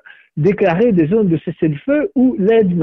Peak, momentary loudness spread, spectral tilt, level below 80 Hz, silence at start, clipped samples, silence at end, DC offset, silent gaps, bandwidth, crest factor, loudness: -4 dBFS; 6 LU; -10 dB/octave; -48 dBFS; 0.35 s; under 0.1%; 0 s; under 0.1%; none; 6 kHz; 10 dB; -15 LUFS